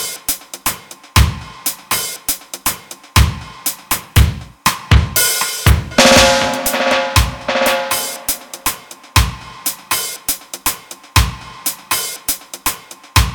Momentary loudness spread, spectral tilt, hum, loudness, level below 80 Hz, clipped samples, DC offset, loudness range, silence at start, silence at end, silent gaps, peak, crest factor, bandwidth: 9 LU; -3 dB/octave; none; -16 LUFS; -24 dBFS; under 0.1%; under 0.1%; 6 LU; 0 s; 0 s; none; 0 dBFS; 16 dB; over 20 kHz